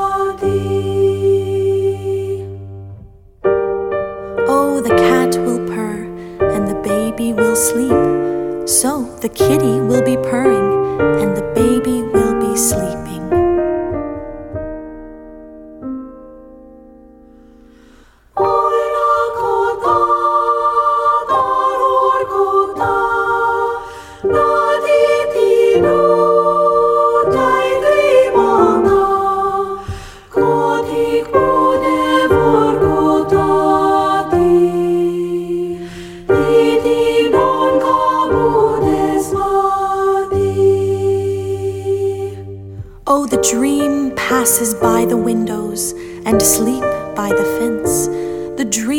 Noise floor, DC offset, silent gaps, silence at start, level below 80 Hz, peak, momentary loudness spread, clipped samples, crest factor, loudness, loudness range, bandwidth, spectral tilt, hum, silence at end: -46 dBFS; under 0.1%; none; 0 s; -40 dBFS; 0 dBFS; 11 LU; under 0.1%; 14 dB; -14 LUFS; 6 LU; 17.5 kHz; -5 dB/octave; none; 0 s